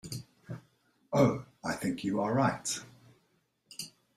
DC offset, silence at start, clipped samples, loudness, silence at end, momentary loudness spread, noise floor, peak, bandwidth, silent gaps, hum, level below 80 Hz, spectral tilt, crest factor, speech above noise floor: under 0.1%; 0.05 s; under 0.1%; -31 LUFS; 0.3 s; 19 LU; -74 dBFS; -12 dBFS; 15 kHz; none; none; -66 dBFS; -5 dB/octave; 22 dB; 45 dB